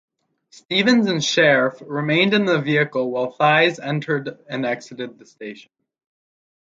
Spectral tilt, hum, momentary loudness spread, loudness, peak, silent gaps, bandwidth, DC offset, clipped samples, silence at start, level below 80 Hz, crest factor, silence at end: -4.5 dB/octave; none; 18 LU; -19 LUFS; -2 dBFS; none; 7.8 kHz; under 0.1%; under 0.1%; 0.7 s; -68 dBFS; 18 dB; 1.05 s